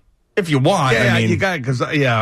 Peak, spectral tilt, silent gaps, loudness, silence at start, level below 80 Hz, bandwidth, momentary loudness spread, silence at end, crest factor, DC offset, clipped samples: -6 dBFS; -5.5 dB/octave; none; -17 LUFS; 0.35 s; -48 dBFS; 13.5 kHz; 7 LU; 0 s; 10 dB; under 0.1%; under 0.1%